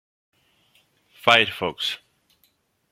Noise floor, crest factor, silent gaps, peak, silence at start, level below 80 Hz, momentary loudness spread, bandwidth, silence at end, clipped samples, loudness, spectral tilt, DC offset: -67 dBFS; 26 dB; none; 0 dBFS; 1.25 s; -68 dBFS; 11 LU; 16.5 kHz; 0.95 s; under 0.1%; -20 LUFS; -3 dB/octave; under 0.1%